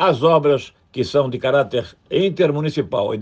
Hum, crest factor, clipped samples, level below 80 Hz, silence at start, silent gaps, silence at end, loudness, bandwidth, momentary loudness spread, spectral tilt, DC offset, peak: none; 16 dB; under 0.1%; -56 dBFS; 0 s; none; 0 s; -19 LUFS; 8.4 kHz; 9 LU; -7 dB/octave; under 0.1%; -2 dBFS